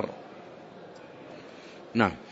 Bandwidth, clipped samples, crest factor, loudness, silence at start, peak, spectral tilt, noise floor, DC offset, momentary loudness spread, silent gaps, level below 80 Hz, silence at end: 8 kHz; under 0.1%; 28 dB; -29 LUFS; 0 s; -6 dBFS; -6.5 dB/octave; -47 dBFS; under 0.1%; 20 LU; none; -64 dBFS; 0 s